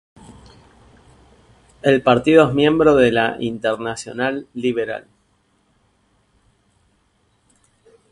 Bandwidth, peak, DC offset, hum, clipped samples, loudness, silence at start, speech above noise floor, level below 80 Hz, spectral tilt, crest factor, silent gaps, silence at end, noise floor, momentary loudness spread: 11 kHz; 0 dBFS; under 0.1%; none; under 0.1%; -17 LUFS; 1.85 s; 46 dB; -50 dBFS; -6 dB/octave; 20 dB; none; 3.1 s; -62 dBFS; 12 LU